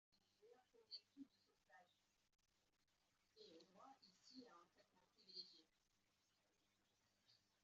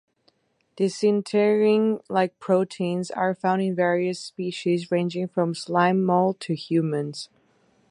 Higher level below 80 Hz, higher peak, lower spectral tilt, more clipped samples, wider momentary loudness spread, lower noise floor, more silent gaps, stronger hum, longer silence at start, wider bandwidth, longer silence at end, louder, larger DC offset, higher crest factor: second, under -90 dBFS vs -72 dBFS; second, -46 dBFS vs -6 dBFS; second, -1 dB/octave vs -6.5 dB/octave; neither; about the same, 10 LU vs 9 LU; first, -87 dBFS vs -66 dBFS; neither; neither; second, 0.1 s vs 0.75 s; second, 7.4 kHz vs 11 kHz; second, 0 s vs 0.65 s; second, -63 LUFS vs -24 LUFS; neither; first, 24 dB vs 18 dB